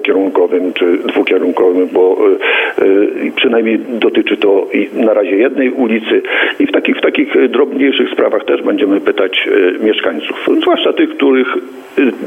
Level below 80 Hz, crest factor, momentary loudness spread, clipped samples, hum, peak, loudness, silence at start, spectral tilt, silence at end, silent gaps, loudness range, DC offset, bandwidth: -66 dBFS; 12 dB; 3 LU; under 0.1%; none; 0 dBFS; -12 LUFS; 0 s; -5.5 dB/octave; 0 s; none; 1 LU; under 0.1%; 8.2 kHz